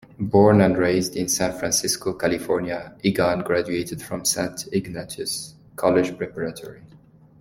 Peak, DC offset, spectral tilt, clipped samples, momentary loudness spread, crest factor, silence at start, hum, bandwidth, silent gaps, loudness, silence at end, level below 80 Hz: -2 dBFS; under 0.1%; -4.5 dB/octave; under 0.1%; 13 LU; 20 dB; 0.2 s; none; 16.5 kHz; none; -22 LUFS; 0.55 s; -52 dBFS